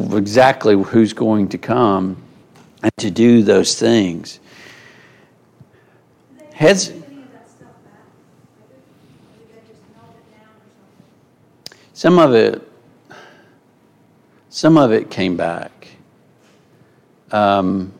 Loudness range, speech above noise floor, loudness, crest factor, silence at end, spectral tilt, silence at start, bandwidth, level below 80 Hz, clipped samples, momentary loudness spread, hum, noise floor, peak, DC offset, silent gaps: 6 LU; 39 dB; -14 LUFS; 18 dB; 0.1 s; -5.5 dB/octave; 0 s; 13.5 kHz; -56 dBFS; under 0.1%; 19 LU; none; -53 dBFS; 0 dBFS; under 0.1%; none